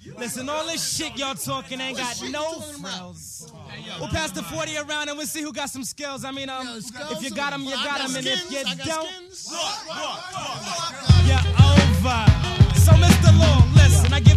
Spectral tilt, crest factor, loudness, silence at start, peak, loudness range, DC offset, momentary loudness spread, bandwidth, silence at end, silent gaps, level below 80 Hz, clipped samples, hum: -5 dB/octave; 20 dB; -20 LUFS; 0.05 s; 0 dBFS; 13 LU; under 0.1%; 18 LU; 14 kHz; 0 s; none; -30 dBFS; under 0.1%; none